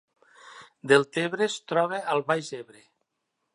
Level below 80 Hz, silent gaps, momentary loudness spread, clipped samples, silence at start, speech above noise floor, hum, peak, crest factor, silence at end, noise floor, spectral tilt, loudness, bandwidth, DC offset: -78 dBFS; none; 17 LU; under 0.1%; 0.45 s; 54 dB; none; -4 dBFS; 24 dB; 0.9 s; -80 dBFS; -4.5 dB/octave; -25 LUFS; 11.5 kHz; under 0.1%